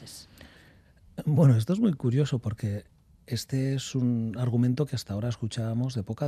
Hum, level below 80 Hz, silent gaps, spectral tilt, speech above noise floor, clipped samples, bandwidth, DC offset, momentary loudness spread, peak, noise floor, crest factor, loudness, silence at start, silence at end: none; -60 dBFS; none; -7.5 dB/octave; 30 dB; under 0.1%; 14 kHz; under 0.1%; 13 LU; -10 dBFS; -56 dBFS; 18 dB; -28 LUFS; 0 s; 0 s